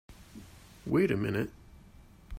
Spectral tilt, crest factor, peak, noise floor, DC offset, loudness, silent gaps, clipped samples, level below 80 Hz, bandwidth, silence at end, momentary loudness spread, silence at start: -7.5 dB/octave; 20 dB; -16 dBFS; -55 dBFS; under 0.1%; -31 LUFS; none; under 0.1%; -56 dBFS; 16 kHz; 0 s; 24 LU; 0.1 s